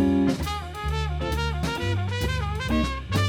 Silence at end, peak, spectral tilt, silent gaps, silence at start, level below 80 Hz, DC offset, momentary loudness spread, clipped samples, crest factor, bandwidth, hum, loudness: 0 s; -10 dBFS; -6 dB/octave; none; 0 s; -32 dBFS; under 0.1%; 5 LU; under 0.1%; 14 dB; 19 kHz; none; -27 LUFS